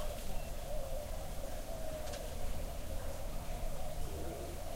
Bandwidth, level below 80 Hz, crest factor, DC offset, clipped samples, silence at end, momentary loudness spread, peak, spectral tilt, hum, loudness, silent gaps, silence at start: 16 kHz; -42 dBFS; 12 dB; under 0.1%; under 0.1%; 0 s; 2 LU; -26 dBFS; -4.5 dB/octave; none; -45 LUFS; none; 0 s